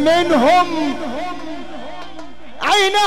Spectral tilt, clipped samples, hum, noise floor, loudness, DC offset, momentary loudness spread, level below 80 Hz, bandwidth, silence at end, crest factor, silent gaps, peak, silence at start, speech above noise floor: -3 dB/octave; under 0.1%; none; -37 dBFS; -16 LUFS; 4%; 20 LU; -48 dBFS; 16.5 kHz; 0 s; 12 dB; none; -4 dBFS; 0 s; 21 dB